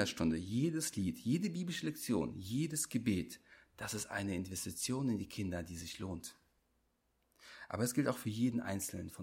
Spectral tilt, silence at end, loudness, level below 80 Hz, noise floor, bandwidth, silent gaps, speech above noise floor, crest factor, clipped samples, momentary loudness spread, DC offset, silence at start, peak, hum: -4.5 dB/octave; 0 s; -38 LUFS; -64 dBFS; -79 dBFS; 16.5 kHz; none; 41 dB; 20 dB; under 0.1%; 10 LU; under 0.1%; 0 s; -20 dBFS; none